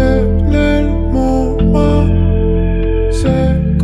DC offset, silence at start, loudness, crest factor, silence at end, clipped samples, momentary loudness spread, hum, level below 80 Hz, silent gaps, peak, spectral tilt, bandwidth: under 0.1%; 0 s; -13 LUFS; 10 dB; 0 s; under 0.1%; 3 LU; none; -16 dBFS; none; 0 dBFS; -8 dB/octave; 10.5 kHz